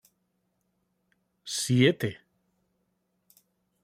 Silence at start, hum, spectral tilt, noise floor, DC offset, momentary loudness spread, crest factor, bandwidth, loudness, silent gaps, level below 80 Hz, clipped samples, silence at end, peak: 1.45 s; none; -5 dB/octave; -76 dBFS; under 0.1%; 13 LU; 26 dB; 16 kHz; -26 LUFS; none; -68 dBFS; under 0.1%; 1.65 s; -6 dBFS